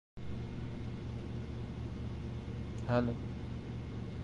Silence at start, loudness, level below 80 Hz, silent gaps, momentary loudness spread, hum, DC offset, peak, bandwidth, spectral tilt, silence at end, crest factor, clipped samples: 0.15 s; -40 LUFS; -48 dBFS; none; 9 LU; none; under 0.1%; -18 dBFS; 9 kHz; -8 dB/octave; 0 s; 20 dB; under 0.1%